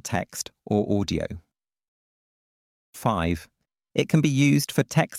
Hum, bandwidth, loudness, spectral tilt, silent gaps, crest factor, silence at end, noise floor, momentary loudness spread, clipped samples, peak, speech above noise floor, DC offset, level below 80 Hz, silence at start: none; 16 kHz; -25 LUFS; -5.5 dB/octave; 1.88-2.93 s; 20 dB; 0 s; under -90 dBFS; 13 LU; under 0.1%; -6 dBFS; over 66 dB; under 0.1%; -50 dBFS; 0.05 s